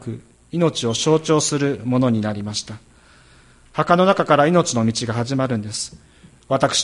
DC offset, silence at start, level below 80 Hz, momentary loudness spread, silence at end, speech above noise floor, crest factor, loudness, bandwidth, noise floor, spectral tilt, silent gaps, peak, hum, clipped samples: under 0.1%; 0 s; -52 dBFS; 14 LU; 0 s; 31 dB; 20 dB; -19 LUFS; 11.5 kHz; -50 dBFS; -4.5 dB/octave; none; 0 dBFS; none; under 0.1%